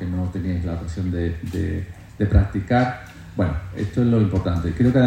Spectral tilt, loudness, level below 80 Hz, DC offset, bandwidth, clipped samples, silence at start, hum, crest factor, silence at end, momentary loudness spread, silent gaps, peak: -8.5 dB/octave; -23 LUFS; -34 dBFS; under 0.1%; 9.6 kHz; under 0.1%; 0 s; none; 18 dB; 0 s; 9 LU; none; -4 dBFS